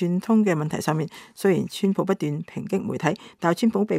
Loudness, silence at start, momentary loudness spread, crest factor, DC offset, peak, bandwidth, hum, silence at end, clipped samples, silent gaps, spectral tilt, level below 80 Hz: -24 LUFS; 0 s; 8 LU; 18 dB; under 0.1%; -4 dBFS; 15.5 kHz; none; 0 s; under 0.1%; none; -6.5 dB/octave; -66 dBFS